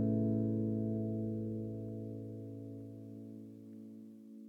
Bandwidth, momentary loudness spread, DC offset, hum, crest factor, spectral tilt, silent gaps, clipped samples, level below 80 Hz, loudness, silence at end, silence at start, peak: 1.9 kHz; 18 LU; under 0.1%; none; 16 dB; -12 dB/octave; none; under 0.1%; -66 dBFS; -39 LUFS; 0 s; 0 s; -24 dBFS